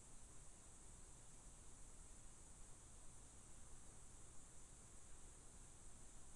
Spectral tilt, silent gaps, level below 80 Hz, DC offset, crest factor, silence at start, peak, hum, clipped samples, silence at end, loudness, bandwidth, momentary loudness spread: -3 dB/octave; none; -64 dBFS; under 0.1%; 12 dB; 0 s; -46 dBFS; none; under 0.1%; 0 s; -63 LUFS; 11.5 kHz; 0 LU